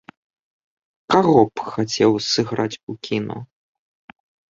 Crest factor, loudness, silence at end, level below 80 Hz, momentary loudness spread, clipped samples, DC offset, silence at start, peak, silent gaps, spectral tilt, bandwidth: 20 dB; -19 LUFS; 1.05 s; -58 dBFS; 14 LU; under 0.1%; under 0.1%; 1.1 s; -2 dBFS; 2.83-2.87 s; -5 dB/octave; 7.6 kHz